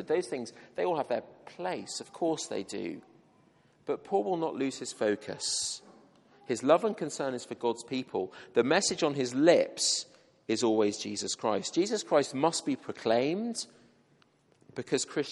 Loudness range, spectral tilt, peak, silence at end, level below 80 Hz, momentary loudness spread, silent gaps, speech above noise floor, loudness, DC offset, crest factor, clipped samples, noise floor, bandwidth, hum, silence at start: 7 LU; -3.5 dB/octave; -10 dBFS; 0 s; -78 dBFS; 13 LU; none; 36 dB; -31 LUFS; under 0.1%; 22 dB; under 0.1%; -66 dBFS; 11.5 kHz; none; 0 s